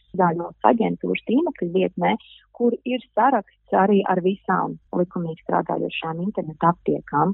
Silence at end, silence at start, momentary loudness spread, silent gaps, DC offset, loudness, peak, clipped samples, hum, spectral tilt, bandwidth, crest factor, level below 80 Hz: 0 s; 0.15 s; 7 LU; none; under 0.1%; -22 LUFS; 0 dBFS; under 0.1%; none; -11 dB/octave; 4.1 kHz; 22 dB; -60 dBFS